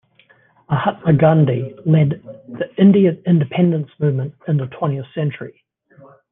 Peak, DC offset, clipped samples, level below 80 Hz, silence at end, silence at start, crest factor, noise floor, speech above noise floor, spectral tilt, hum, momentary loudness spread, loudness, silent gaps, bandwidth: -2 dBFS; under 0.1%; under 0.1%; -56 dBFS; 0.8 s; 0.7 s; 16 dB; -54 dBFS; 38 dB; -12 dB/octave; none; 14 LU; -17 LUFS; none; 3.8 kHz